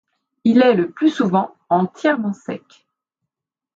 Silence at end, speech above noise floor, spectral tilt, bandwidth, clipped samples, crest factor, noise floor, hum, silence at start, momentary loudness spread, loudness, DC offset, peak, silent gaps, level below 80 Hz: 1.2 s; 65 dB; -7 dB/octave; 7.6 kHz; under 0.1%; 16 dB; -82 dBFS; none; 0.45 s; 14 LU; -18 LUFS; under 0.1%; -2 dBFS; none; -68 dBFS